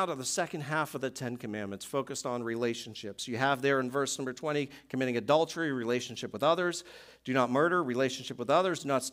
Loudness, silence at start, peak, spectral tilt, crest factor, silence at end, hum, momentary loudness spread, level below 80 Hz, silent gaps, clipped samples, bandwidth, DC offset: -31 LUFS; 0 s; -12 dBFS; -4 dB/octave; 20 dB; 0 s; none; 11 LU; -74 dBFS; none; under 0.1%; 16 kHz; under 0.1%